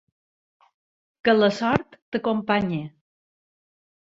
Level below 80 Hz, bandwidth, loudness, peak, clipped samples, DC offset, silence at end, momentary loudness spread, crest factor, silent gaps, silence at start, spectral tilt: -58 dBFS; 7.8 kHz; -23 LUFS; -2 dBFS; under 0.1%; under 0.1%; 1.25 s; 12 LU; 24 dB; 2.02-2.12 s; 1.25 s; -6.5 dB/octave